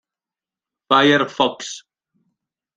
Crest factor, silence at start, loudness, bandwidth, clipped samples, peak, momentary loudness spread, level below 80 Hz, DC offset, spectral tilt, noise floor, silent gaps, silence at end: 20 dB; 0.9 s; -16 LUFS; 9.4 kHz; under 0.1%; -2 dBFS; 18 LU; -64 dBFS; under 0.1%; -4 dB/octave; -90 dBFS; none; 1 s